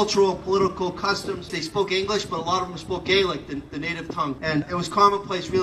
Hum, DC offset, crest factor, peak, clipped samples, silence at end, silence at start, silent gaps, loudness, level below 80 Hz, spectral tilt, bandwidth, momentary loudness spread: none; under 0.1%; 20 dB; -4 dBFS; under 0.1%; 0 s; 0 s; none; -24 LUFS; -48 dBFS; -4.5 dB/octave; 12.5 kHz; 10 LU